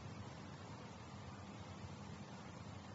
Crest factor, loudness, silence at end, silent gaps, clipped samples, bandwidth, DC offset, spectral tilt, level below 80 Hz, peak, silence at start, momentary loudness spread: 14 dB; -53 LUFS; 0 s; none; under 0.1%; 7.6 kHz; under 0.1%; -5.5 dB/octave; -68 dBFS; -40 dBFS; 0 s; 1 LU